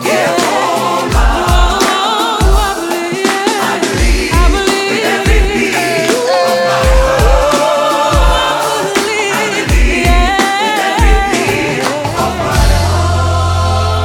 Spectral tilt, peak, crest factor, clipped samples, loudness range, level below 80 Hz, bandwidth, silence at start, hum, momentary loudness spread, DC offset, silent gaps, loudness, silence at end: -4.5 dB/octave; 0 dBFS; 10 dB; under 0.1%; 1 LU; -16 dBFS; 17.5 kHz; 0 s; none; 3 LU; under 0.1%; none; -11 LUFS; 0 s